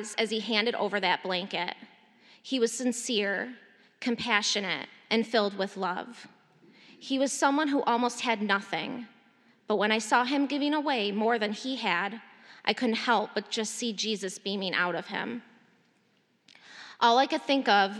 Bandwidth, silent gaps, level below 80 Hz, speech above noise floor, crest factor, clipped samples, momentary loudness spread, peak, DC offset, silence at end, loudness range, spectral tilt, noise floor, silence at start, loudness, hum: 13 kHz; none; -82 dBFS; 41 dB; 22 dB; under 0.1%; 11 LU; -6 dBFS; under 0.1%; 0 s; 3 LU; -3 dB/octave; -69 dBFS; 0 s; -28 LUFS; none